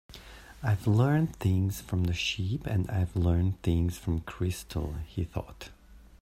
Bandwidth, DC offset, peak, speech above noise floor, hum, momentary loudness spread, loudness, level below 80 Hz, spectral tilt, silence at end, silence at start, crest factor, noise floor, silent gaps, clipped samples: 16 kHz; under 0.1%; -12 dBFS; 20 dB; none; 15 LU; -30 LUFS; -46 dBFS; -6.5 dB/octave; 0.2 s; 0.1 s; 18 dB; -48 dBFS; none; under 0.1%